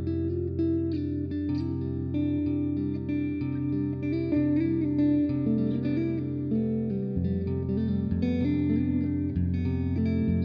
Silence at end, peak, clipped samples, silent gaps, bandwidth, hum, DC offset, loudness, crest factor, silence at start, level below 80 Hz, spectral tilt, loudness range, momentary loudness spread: 0 s; -14 dBFS; under 0.1%; none; 5.2 kHz; none; under 0.1%; -28 LUFS; 12 dB; 0 s; -46 dBFS; -11 dB/octave; 2 LU; 4 LU